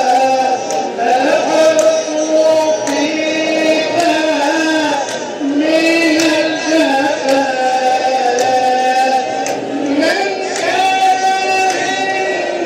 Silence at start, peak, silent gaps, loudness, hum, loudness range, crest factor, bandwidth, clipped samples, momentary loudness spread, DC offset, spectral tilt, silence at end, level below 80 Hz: 0 s; 0 dBFS; none; -13 LUFS; none; 1 LU; 12 dB; 16 kHz; under 0.1%; 6 LU; under 0.1%; -2.5 dB/octave; 0 s; -64 dBFS